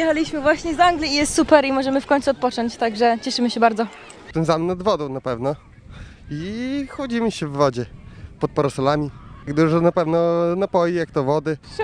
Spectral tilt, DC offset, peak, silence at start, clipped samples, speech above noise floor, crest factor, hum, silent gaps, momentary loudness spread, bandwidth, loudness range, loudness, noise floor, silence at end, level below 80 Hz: -5.5 dB/octave; under 0.1%; -2 dBFS; 0 s; under 0.1%; 20 dB; 20 dB; none; none; 11 LU; 10.5 kHz; 6 LU; -20 LUFS; -40 dBFS; 0 s; -46 dBFS